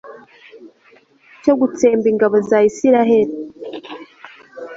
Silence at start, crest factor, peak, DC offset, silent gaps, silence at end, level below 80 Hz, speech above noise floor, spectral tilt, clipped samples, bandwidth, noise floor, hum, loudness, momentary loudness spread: 0.05 s; 16 dB; -2 dBFS; under 0.1%; none; 0 s; -60 dBFS; 38 dB; -6 dB/octave; under 0.1%; 7.8 kHz; -51 dBFS; none; -15 LUFS; 22 LU